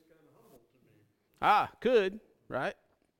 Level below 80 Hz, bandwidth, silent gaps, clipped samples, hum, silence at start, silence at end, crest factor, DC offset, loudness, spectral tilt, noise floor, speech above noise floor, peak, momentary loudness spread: -68 dBFS; 16.5 kHz; none; under 0.1%; none; 1.4 s; 0.45 s; 20 dB; under 0.1%; -30 LUFS; -5.5 dB/octave; -68 dBFS; 39 dB; -12 dBFS; 12 LU